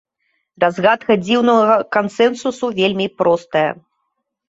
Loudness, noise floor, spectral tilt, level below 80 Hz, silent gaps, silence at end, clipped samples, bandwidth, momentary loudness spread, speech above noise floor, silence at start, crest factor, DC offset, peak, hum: -16 LUFS; -73 dBFS; -5.5 dB/octave; -60 dBFS; none; 0.75 s; under 0.1%; 8 kHz; 7 LU; 57 dB; 0.6 s; 16 dB; under 0.1%; -2 dBFS; none